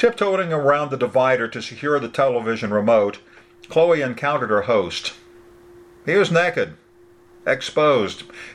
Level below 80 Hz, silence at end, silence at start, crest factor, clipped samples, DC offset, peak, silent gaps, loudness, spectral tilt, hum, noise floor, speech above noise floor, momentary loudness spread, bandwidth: -62 dBFS; 0 s; 0 s; 18 dB; under 0.1%; under 0.1%; -2 dBFS; none; -20 LUFS; -5.5 dB/octave; none; -51 dBFS; 31 dB; 10 LU; 11.5 kHz